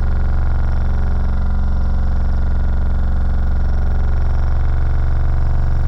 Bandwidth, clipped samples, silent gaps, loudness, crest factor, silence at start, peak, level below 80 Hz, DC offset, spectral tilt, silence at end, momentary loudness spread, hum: 5.6 kHz; under 0.1%; none; -20 LUFS; 8 dB; 0 s; -6 dBFS; -14 dBFS; under 0.1%; -9 dB/octave; 0 s; 1 LU; none